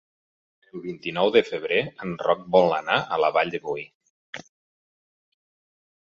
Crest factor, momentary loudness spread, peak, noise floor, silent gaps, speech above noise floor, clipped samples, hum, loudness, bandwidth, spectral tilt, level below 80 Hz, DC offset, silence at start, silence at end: 22 dB; 21 LU; -4 dBFS; under -90 dBFS; 3.95-4.01 s, 4.10-4.33 s; over 67 dB; under 0.1%; none; -23 LUFS; 7.2 kHz; -5.5 dB/octave; -66 dBFS; under 0.1%; 0.75 s; 1.75 s